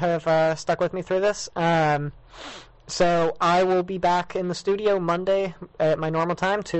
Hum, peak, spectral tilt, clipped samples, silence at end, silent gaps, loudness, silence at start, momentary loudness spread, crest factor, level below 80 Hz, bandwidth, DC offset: none; -10 dBFS; -5.5 dB/octave; under 0.1%; 0 s; none; -23 LUFS; 0 s; 12 LU; 12 dB; -52 dBFS; 8.4 kHz; under 0.1%